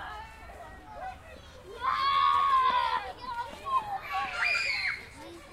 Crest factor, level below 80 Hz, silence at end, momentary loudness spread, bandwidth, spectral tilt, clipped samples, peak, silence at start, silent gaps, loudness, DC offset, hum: 16 dB; -56 dBFS; 0 s; 22 LU; 14.5 kHz; -2 dB/octave; under 0.1%; -16 dBFS; 0 s; none; -28 LUFS; under 0.1%; none